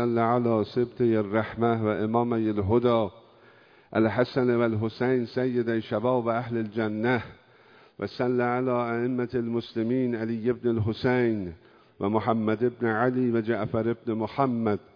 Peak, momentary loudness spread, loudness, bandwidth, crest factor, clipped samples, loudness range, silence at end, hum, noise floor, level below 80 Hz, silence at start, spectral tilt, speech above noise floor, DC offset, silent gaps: -8 dBFS; 5 LU; -26 LUFS; 5.4 kHz; 18 dB; under 0.1%; 2 LU; 0.15 s; none; -56 dBFS; -62 dBFS; 0 s; -9.5 dB/octave; 30 dB; under 0.1%; none